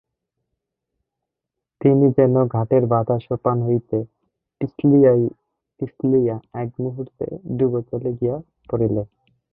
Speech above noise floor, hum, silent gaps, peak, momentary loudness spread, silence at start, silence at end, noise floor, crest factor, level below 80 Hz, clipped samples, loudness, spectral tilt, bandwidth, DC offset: 64 dB; none; none; -4 dBFS; 15 LU; 1.8 s; 0.45 s; -83 dBFS; 18 dB; -54 dBFS; under 0.1%; -20 LUFS; -14.5 dB/octave; 3.9 kHz; under 0.1%